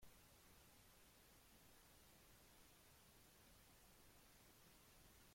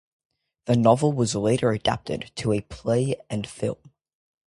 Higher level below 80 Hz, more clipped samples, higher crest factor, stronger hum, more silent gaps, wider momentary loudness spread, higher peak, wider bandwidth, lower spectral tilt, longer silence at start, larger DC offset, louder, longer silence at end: second, -78 dBFS vs -52 dBFS; neither; about the same, 16 dB vs 20 dB; neither; neither; second, 1 LU vs 12 LU; second, -52 dBFS vs -4 dBFS; first, 16.5 kHz vs 11.5 kHz; second, -3 dB/octave vs -6 dB/octave; second, 0 s vs 0.65 s; neither; second, -69 LUFS vs -24 LUFS; second, 0 s vs 0.75 s